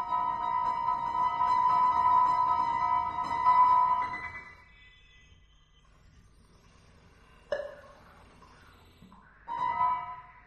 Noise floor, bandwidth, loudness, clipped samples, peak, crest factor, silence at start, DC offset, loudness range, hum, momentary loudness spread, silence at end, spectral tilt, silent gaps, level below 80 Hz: -61 dBFS; 7.8 kHz; -27 LUFS; under 0.1%; -14 dBFS; 16 dB; 0 s; under 0.1%; 20 LU; none; 15 LU; 0.25 s; -4.5 dB/octave; none; -60 dBFS